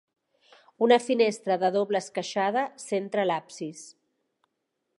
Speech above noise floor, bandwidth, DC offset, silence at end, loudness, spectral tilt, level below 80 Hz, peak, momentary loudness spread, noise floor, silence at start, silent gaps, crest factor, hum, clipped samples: 54 dB; 11.5 kHz; under 0.1%; 1.05 s; -26 LUFS; -4.5 dB/octave; -84 dBFS; -8 dBFS; 15 LU; -80 dBFS; 0.8 s; none; 20 dB; none; under 0.1%